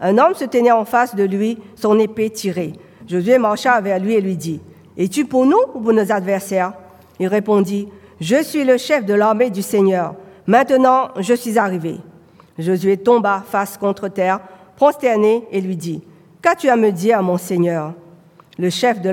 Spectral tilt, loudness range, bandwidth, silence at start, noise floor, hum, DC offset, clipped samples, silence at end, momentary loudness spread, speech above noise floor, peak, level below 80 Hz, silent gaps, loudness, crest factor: -6 dB/octave; 3 LU; 18 kHz; 0 s; -46 dBFS; none; under 0.1%; under 0.1%; 0 s; 10 LU; 30 dB; 0 dBFS; -66 dBFS; none; -17 LUFS; 16 dB